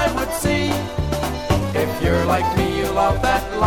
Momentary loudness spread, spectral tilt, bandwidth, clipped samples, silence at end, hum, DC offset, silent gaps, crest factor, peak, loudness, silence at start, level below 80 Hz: 5 LU; -5.5 dB/octave; 17.5 kHz; under 0.1%; 0 s; none; under 0.1%; none; 16 dB; -4 dBFS; -20 LUFS; 0 s; -30 dBFS